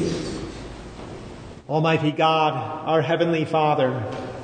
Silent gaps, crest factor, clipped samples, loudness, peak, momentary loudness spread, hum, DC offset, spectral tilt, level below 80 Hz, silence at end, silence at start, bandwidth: none; 16 dB; under 0.1%; -22 LUFS; -6 dBFS; 18 LU; none; under 0.1%; -6.5 dB/octave; -48 dBFS; 0 s; 0 s; 9.6 kHz